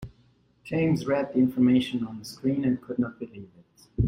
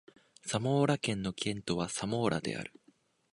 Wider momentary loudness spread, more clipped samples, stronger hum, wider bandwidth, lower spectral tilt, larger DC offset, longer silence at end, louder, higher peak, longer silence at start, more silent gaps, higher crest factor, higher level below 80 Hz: first, 19 LU vs 11 LU; neither; neither; first, 15.5 kHz vs 11.5 kHz; first, -7.5 dB/octave vs -5 dB/octave; neither; second, 0 s vs 0.65 s; first, -26 LUFS vs -33 LUFS; about the same, -12 dBFS vs -14 dBFS; second, 0 s vs 0.45 s; neither; about the same, 16 dB vs 20 dB; first, -46 dBFS vs -62 dBFS